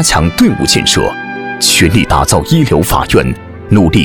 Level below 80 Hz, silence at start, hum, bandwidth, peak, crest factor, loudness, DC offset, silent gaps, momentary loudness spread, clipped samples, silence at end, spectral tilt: -24 dBFS; 0 s; none; over 20 kHz; 0 dBFS; 10 dB; -10 LUFS; under 0.1%; none; 9 LU; 0.1%; 0 s; -4 dB/octave